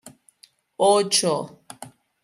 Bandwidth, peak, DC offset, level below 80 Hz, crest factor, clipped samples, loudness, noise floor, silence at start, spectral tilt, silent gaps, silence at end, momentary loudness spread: 15.5 kHz; -6 dBFS; under 0.1%; -74 dBFS; 20 dB; under 0.1%; -20 LUFS; -57 dBFS; 0.05 s; -3 dB/octave; none; 0.35 s; 23 LU